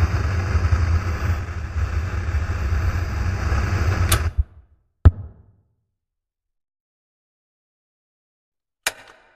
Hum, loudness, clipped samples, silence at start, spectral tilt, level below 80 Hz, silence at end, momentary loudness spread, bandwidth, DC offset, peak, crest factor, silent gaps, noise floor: none; -23 LUFS; under 0.1%; 0 s; -5 dB/octave; -26 dBFS; 0.35 s; 9 LU; 14 kHz; under 0.1%; 0 dBFS; 22 dB; 6.80-8.52 s; -82 dBFS